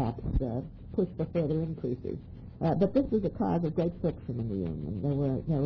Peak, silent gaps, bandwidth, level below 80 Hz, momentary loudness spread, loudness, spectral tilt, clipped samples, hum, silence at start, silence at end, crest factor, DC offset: -14 dBFS; none; 5.4 kHz; -42 dBFS; 9 LU; -31 LUFS; -11.5 dB/octave; under 0.1%; none; 0 s; 0 s; 16 dB; under 0.1%